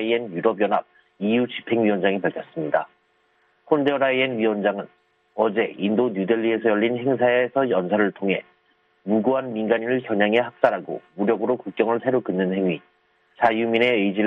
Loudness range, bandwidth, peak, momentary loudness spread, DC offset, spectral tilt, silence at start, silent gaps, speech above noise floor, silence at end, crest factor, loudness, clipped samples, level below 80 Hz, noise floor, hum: 2 LU; 5.4 kHz; -2 dBFS; 6 LU; under 0.1%; -8.5 dB/octave; 0 s; none; 43 dB; 0 s; 20 dB; -22 LUFS; under 0.1%; -68 dBFS; -64 dBFS; none